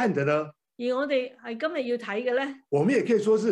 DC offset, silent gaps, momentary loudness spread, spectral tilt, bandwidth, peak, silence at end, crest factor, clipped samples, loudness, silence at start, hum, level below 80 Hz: under 0.1%; none; 9 LU; -6.5 dB/octave; 10.5 kHz; -12 dBFS; 0 s; 14 dB; under 0.1%; -27 LUFS; 0 s; none; -80 dBFS